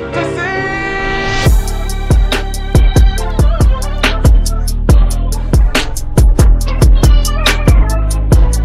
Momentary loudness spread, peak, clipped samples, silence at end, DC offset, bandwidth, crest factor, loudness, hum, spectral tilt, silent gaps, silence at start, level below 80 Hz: 6 LU; 0 dBFS; under 0.1%; 0 s; under 0.1%; 15 kHz; 10 dB; -13 LUFS; none; -5 dB/octave; none; 0 s; -10 dBFS